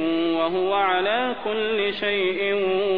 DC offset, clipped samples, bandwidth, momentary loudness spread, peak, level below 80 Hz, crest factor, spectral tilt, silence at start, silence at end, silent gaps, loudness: 0.7%; under 0.1%; 5.2 kHz; 3 LU; -10 dBFS; -58 dBFS; 14 dB; -7 dB/octave; 0 s; 0 s; none; -22 LUFS